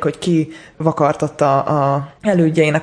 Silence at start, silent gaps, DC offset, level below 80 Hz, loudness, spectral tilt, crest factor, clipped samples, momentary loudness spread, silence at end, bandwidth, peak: 0 s; none; under 0.1%; -54 dBFS; -17 LUFS; -7 dB/octave; 14 dB; under 0.1%; 6 LU; 0 s; 10.5 kHz; -2 dBFS